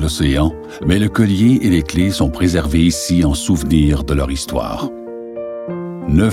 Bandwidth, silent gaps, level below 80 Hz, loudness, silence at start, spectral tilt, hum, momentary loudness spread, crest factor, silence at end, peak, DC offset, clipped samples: 16 kHz; none; -26 dBFS; -16 LUFS; 0 s; -6 dB/octave; none; 13 LU; 14 dB; 0 s; -2 dBFS; under 0.1%; under 0.1%